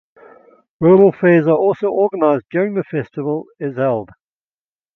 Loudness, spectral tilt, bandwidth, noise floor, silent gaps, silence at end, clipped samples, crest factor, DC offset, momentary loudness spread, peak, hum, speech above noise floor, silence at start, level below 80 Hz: -16 LUFS; -10.5 dB/octave; 4 kHz; under -90 dBFS; none; 0.9 s; under 0.1%; 16 dB; under 0.1%; 13 LU; 0 dBFS; none; over 75 dB; 0.8 s; -62 dBFS